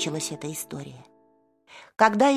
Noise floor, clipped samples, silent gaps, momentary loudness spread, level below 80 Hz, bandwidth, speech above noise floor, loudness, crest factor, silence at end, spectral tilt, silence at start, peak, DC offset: -63 dBFS; under 0.1%; none; 21 LU; -70 dBFS; 15 kHz; 39 dB; -25 LUFS; 24 dB; 0 s; -4 dB/octave; 0 s; -2 dBFS; under 0.1%